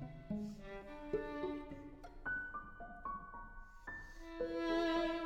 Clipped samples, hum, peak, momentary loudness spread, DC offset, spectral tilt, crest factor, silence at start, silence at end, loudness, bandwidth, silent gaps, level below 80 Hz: under 0.1%; none; -26 dBFS; 16 LU; under 0.1%; -6 dB/octave; 16 dB; 0 s; 0 s; -43 LUFS; 9 kHz; none; -56 dBFS